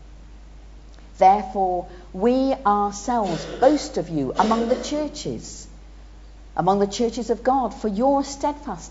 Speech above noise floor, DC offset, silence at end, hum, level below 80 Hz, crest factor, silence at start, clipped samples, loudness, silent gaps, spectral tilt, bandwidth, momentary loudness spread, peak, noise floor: 21 dB; under 0.1%; 0 s; none; -42 dBFS; 20 dB; 0 s; under 0.1%; -22 LUFS; none; -5.5 dB/octave; 8 kHz; 12 LU; -4 dBFS; -43 dBFS